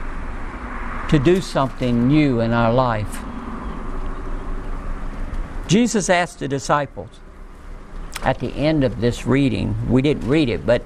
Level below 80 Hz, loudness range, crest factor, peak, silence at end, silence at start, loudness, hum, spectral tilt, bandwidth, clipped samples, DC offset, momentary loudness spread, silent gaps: -30 dBFS; 4 LU; 18 dB; -2 dBFS; 0 s; 0 s; -19 LUFS; none; -6 dB/octave; 13.5 kHz; under 0.1%; under 0.1%; 15 LU; none